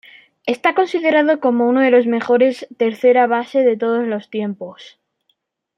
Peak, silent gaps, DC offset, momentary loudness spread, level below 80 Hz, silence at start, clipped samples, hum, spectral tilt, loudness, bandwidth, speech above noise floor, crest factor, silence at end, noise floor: -2 dBFS; none; under 0.1%; 11 LU; -72 dBFS; 0.45 s; under 0.1%; none; -6 dB/octave; -16 LUFS; 9.6 kHz; 52 dB; 16 dB; 0.95 s; -68 dBFS